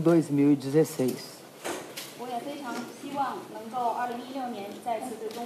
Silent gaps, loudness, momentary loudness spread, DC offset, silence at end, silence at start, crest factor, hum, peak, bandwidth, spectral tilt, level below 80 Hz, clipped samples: none; -30 LUFS; 15 LU; under 0.1%; 0 s; 0 s; 18 dB; none; -12 dBFS; 15.5 kHz; -6 dB/octave; -82 dBFS; under 0.1%